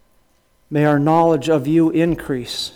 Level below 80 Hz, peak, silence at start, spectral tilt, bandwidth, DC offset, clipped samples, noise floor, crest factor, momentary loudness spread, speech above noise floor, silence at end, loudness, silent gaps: -48 dBFS; -4 dBFS; 0.7 s; -6.5 dB/octave; 16 kHz; under 0.1%; under 0.1%; -58 dBFS; 14 dB; 9 LU; 42 dB; 0.05 s; -17 LUFS; none